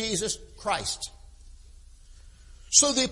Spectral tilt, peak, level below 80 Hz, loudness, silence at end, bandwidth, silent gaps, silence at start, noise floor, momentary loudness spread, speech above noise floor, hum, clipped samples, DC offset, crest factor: -1 dB/octave; -4 dBFS; -50 dBFS; -24 LUFS; 0 s; 11.5 kHz; none; 0 s; -50 dBFS; 15 LU; 24 dB; none; under 0.1%; under 0.1%; 26 dB